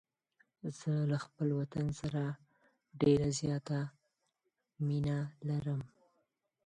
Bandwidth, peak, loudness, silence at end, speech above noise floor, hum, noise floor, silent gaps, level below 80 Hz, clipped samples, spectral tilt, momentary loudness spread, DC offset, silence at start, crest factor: 9.8 kHz; -18 dBFS; -36 LUFS; 0.8 s; 50 dB; none; -84 dBFS; none; -64 dBFS; under 0.1%; -7 dB/octave; 12 LU; under 0.1%; 0.65 s; 20 dB